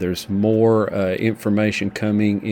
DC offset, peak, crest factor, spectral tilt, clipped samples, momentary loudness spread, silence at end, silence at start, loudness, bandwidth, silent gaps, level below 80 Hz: under 0.1%; -4 dBFS; 14 dB; -7 dB/octave; under 0.1%; 5 LU; 0 s; 0 s; -19 LUFS; 17 kHz; none; -52 dBFS